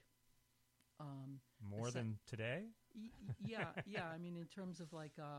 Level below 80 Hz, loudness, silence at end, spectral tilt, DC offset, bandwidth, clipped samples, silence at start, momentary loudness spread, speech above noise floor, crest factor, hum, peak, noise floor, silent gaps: -78 dBFS; -49 LUFS; 0 s; -6 dB/octave; under 0.1%; 16 kHz; under 0.1%; 1 s; 11 LU; 30 dB; 20 dB; none; -30 dBFS; -79 dBFS; none